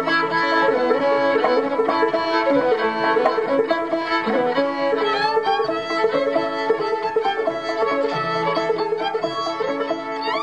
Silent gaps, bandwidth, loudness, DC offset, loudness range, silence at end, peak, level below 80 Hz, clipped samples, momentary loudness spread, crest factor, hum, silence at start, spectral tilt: none; 9.8 kHz; -20 LUFS; 0.2%; 3 LU; 0 s; -4 dBFS; -60 dBFS; under 0.1%; 5 LU; 16 dB; none; 0 s; -5 dB/octave